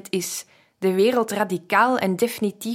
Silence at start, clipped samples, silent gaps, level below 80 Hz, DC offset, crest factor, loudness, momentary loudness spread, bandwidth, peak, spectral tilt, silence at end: 0.15 s; under 0.1%; none; -72 dBFS; under 0.1%; 18 dB; -22 LUFS; 8 LU; 16.5 kHz; -4 dBFS; -4.5 dB/octave; 0 s